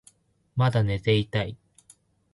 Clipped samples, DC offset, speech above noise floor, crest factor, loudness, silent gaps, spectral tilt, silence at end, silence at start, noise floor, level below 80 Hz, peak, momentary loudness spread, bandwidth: under 0.1%; under 0.1%; 36 dB; 18 dB; -26 LUFS; none; -7 dB/octave; 0.8 s; 0.55 s; -60 dBFS; -50 dBFS; -10 dBFS; 10 LU; 11.5 kHz